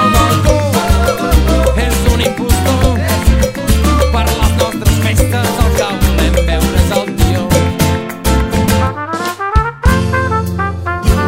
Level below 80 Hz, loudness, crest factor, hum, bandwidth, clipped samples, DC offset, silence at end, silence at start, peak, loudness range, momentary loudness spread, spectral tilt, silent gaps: -16 dBFS; -13 LUFS; 12 dB; none; 16.5 kHz; under 0.1%; 0.3%; 0 s; 0 s; 0 dBFS; 2 LU; 4 LU; -5.5 dB/octave; none